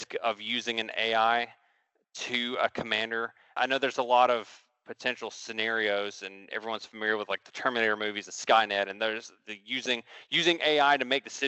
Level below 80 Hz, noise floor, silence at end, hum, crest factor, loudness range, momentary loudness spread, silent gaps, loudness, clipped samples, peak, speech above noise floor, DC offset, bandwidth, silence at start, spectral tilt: -78 dBFS; -72 dBFS; 0 s; none; 22 dB; 4 LU; 13 LU; none; -28 LUFS; under 0.1%; -8 dBFS; 43 dB; under 0.1%; 8.2 kHz; 0 s; -2.5 dB/octave